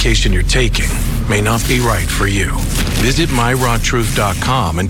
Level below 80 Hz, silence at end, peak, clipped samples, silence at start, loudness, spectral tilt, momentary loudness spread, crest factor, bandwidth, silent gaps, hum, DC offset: -18 dBFS; 0 s; -2 dBFS; under 0.1%; 0 s; -15 LUFS; -4 dB/octave; 3 LU; 12 dB; 17.5 kHz; none; none; under 0.1%